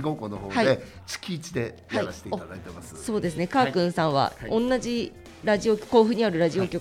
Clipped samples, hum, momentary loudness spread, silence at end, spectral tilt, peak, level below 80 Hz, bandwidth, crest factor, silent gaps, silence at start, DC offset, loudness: under 0.1%; none; 13 LU; 0 s; -5.5 dB/octave; -6 dBFS; -52 dBFS; 15.5 kHz; 20 dB; none; 0 s; under 0.1%; -25 LUFS